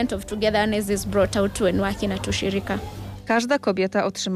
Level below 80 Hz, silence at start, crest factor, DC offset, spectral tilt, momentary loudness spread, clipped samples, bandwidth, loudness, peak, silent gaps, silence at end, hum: -42 dBFS; 0 s; 14 dB; under 0.1%; -5 dB/octave; 6 LU; under 0.1%; 15.5 kHz; -23 LUFS; -10 dBFS; none; 0 s; none